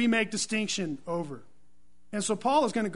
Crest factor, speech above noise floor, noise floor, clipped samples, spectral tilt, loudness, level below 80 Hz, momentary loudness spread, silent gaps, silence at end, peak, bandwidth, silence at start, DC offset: 18 dB; 40 dB; -68 dBFS; under 0.1%; -3.5 dB/octave; -29 LUFS; -66 dBFS; 12 LU; none; 0 s; -12 dBFS; 11 kHz; 0 s; 0.5%